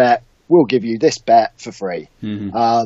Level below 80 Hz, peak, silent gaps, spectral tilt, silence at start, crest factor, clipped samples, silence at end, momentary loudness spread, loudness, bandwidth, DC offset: -56 dBFS; -2 dBFS; none; -5.5 dB/octave; 0 s; 14 dB; under 0.1%; 0 s; 13 LU; -16 LUFS; 8 kHz; under 0.1%